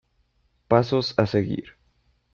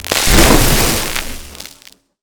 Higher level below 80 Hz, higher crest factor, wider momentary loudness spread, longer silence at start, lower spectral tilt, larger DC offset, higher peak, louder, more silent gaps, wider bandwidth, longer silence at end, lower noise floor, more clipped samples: second, -56 dBFS vs -18 dBFS; first, 20 dB vs 14 dB; second, 9 LU vs 23 LU; first, 0.7 s vs 0 s; first, -7.5 dB/octave vs -3 dB/octave; neither; second, -4 dBFS vs 0 dBFS; second, -23 LUFS vs -11 LUFS; neither; second, 7.2 kHz vs over 20 kHz; about the same, 0.65 s vs 0.55 s; first, -67 dBFS vs -45 dBFS; neither